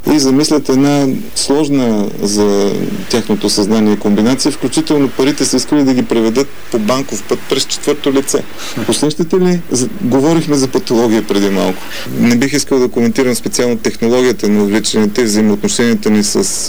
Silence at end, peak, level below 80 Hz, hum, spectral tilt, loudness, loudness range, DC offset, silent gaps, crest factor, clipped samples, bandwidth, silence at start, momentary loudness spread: 0 s; -4 dBFS; -42 dBFS; none; -4.5 dB/octave; -13 LUFS; 2 LU; 7%; none; 8 dB; under 0.1%; over 20 kHz; 0 s; 5 LU